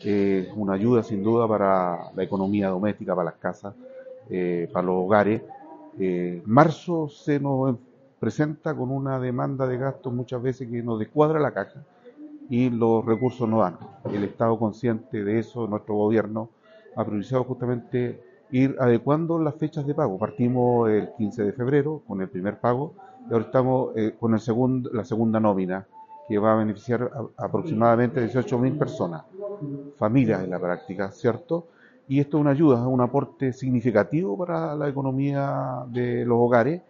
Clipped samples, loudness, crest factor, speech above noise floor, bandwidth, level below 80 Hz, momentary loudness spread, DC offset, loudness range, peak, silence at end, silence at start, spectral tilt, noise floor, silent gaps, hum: under 0.1%; -24 LUFS; 22 dB; 20 dB; 7.4 kHz; -62 dBFS; 10 LU; under 0.1%; 3 LU; -2 dBFS; 0.1 s; 0 s; -8 dB/octave; -44 dBFS; none; none